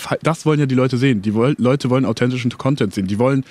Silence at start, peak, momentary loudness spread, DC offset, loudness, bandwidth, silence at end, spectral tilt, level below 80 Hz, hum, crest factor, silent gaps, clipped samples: 0 s; 0 dBFS; 4 LU; under 0.1%; -18 LUFS; 13.5 kHz; 0.05 s; -7 dB/octave; -56 dBFS; none; 16 dB; none; under 0.1%